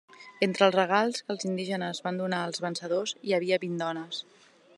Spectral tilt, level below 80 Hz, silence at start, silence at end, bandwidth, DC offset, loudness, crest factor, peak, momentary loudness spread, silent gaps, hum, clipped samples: -4.5 dB/octave; -84 dBFS; 0.2 s; 0.55 s; 11.5 kHz; under 0.1%; -29 LUFS; 22 dB; -6 dBFS; 9 LU; none; none; under 0.1%